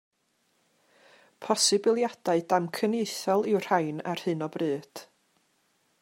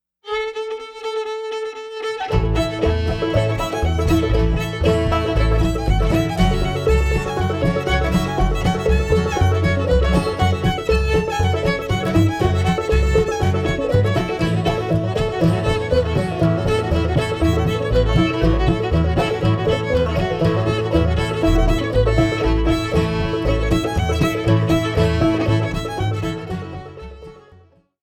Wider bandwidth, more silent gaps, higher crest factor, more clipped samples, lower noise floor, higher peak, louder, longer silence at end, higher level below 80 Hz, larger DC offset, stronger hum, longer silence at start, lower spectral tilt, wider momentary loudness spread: first, 16 kHz vs 14.5 kHz; neither; first, 20 dB vs 14 dB; neither; first, -72 dBFS vs -50 dBFS; second, -10 dBFS vs -4 dBFS; second, -27 LUFS vs -19 LUFS; first, 1 s vs 0.6 s; second, -82 dBFS vs -24 dBFS; neither; neither; first, 1.4 s vs 0.25 s; second, -3.5 dB/octave vs -6.5 dB/octave; first, 10 LU vs 7 LU